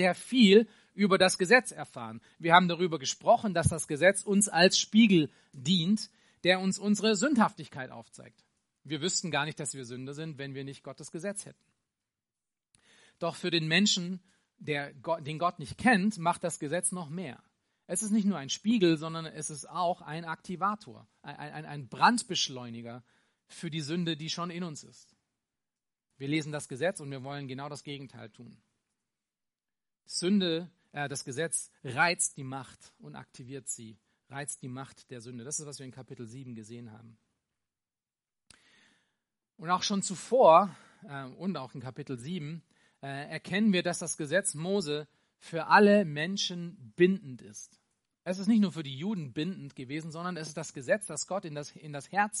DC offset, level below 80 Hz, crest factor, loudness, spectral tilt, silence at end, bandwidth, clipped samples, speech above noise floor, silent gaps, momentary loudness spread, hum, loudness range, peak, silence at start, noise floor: under 0.1%; -66 dBFS; 26 dB; -29 LUFS; -4 dB/octave; 0 s; 11.5 kHz; under 0.1%; over 60 dB; none; 20 LU; none; 15 LU; -4 dBFS; 0 s; under -90 dBFS